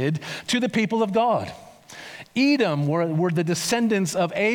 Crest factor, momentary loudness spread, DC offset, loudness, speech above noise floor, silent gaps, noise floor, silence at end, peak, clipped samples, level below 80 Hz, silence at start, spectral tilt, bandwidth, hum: 14 dB; 16 LU; under 0.1%; -23 LUFS; 20 dB; none; -42 dBFS; 0 s; -10 dBFS; under 0.1%; -66 dBFS; 0 s; -5 dB/octave; 19 kHz; none